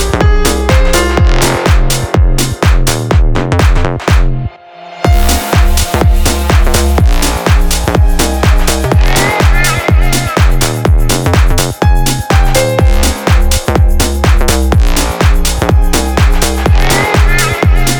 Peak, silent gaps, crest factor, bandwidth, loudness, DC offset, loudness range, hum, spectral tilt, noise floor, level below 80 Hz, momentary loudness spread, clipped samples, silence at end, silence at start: 0 dBFS; none; 8 dB; over 20 kHz; -11 LUFS; under 0.1%; 1 LU; none; -4.5 dB/octave; -30 dBFS; -10 dBFS; 3 LU; under 0.1%; 0 s; 0 s